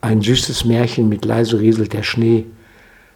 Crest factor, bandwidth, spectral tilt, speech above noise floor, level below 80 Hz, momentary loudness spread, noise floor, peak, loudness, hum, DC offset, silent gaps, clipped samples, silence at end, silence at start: 16 dB; 17 kHz; -5.5 dB/octave; 31 dB; -40 dBFS; 4 LU; -47 dBFS; 0 dBFS; -16 LUFS; none; under 0.1%; none; under 0.1%; 0.65 s; 0.05 s